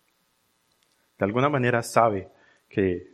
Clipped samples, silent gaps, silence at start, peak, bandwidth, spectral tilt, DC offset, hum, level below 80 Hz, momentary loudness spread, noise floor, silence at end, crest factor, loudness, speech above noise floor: under 0.1%; none; 1.2 s; -2 dBFS; 14.5 kHz; -6 dB/octave; under 0.1%; none; -62 dBFS; 9 LU; -69 dBFS; 0.1 s; 24 dB; -24 LUFS; 46 dB